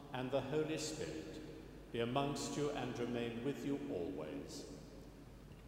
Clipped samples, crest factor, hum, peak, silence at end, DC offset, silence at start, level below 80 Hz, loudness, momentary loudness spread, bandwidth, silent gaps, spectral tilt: under 0.1%; 22 dB; none; -22 dBFS; 0 s; under 0.1%; 0 s; -62 dBFS; -42 LUFS; 16 LU; 16 kHz; none; -5 dB/octave